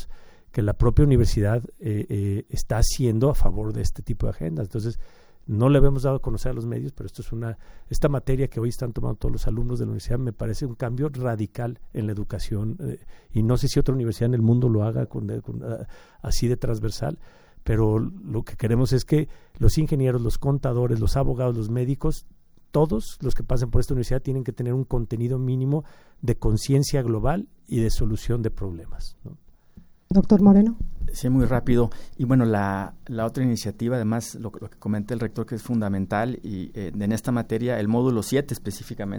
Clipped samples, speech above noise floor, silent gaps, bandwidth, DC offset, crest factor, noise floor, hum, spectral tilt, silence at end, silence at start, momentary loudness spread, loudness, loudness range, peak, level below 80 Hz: under 0.1%; 27 dB; none; over 20 kHz; under 0.1%; 20 dB; -50 dBFS; none; -7.5 dB/octave; 0 s; 0 s; 12 LU; -25 LUFS; 6 LU; -2 dBFS; -30 dBFS